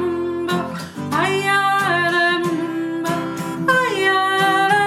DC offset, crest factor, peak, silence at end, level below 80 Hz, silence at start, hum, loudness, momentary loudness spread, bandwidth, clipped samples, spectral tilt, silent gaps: under 0.1%; 14 dB; -4 dBFS; 0 s; -60 dBFS; 0 s; none; -18 LUFS; 8 LU; 16 kHz; under 0.1%; -4.5 dB/octave; none